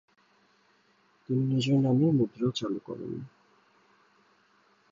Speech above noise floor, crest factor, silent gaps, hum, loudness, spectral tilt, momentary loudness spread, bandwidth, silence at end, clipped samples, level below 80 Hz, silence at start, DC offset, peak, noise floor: 39 dB; 16 dB; none; none; -28 LUFS; -7.5 dB/octave; 15 LU; 7.6 kHz; 1.65 s; under 0.1%; -70 dBFS; 1.3 s; under 0.1%; -14 dBFS; -66 dBFS